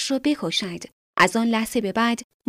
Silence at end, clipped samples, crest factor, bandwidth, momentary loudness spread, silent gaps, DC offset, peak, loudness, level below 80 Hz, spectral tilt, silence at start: 0.25 s; under 0.1%; 18 dB; 15.5 kHz; 11 LU; 0.92-1.14 s; under 0.1%; -4 dBFS; -22 LUFS; -58 dBFS; -3.5 dB/octave; 0 s